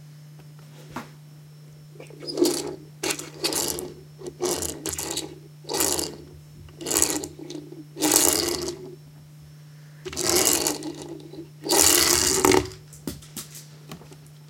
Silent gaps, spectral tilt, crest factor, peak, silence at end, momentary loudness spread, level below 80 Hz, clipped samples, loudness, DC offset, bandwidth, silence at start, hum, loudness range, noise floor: none; -2 dB/octave; 28 dB; 0 dBFS; 0 s; 24 LU; -52 dBFS; under 0.1%; -22 LUFS; under 0.1%; 17 kHz; 0 s; none; 8 LU; -46 dBFS